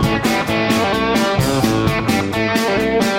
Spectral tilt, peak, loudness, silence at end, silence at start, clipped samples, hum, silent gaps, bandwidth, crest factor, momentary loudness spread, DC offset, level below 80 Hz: -5 dB/octave; -2 dBFS; -16 LUFS; 0 s; 0 s; under 0.1%; none; none; 16.5 kHz; 14 dB; 2 LU; under 0.1%; -36 dBFS